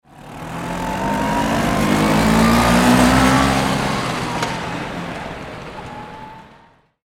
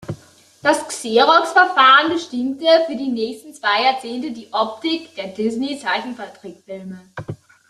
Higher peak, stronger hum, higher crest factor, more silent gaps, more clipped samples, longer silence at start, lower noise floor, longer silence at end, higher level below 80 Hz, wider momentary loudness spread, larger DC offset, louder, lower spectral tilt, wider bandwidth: about the same, 0 dBFS vs 0 dBFS; neither; about the same, 18 dB vs 18 dB; neither; neither; first, 0.15 s vs 0 s; first, -51 dBFS vs -47 dBFS; first, 0.65 s vs 0.35 s; first, -32 dBFS vs -64 dBFS; about the same, 20 LU vs 21 LU; neither; about the same, -17 LUFS vs -17 LUFS; first, -5 dB/octave vs -3.5 dB/octave; first, 16.5 kHz vs 13 kHz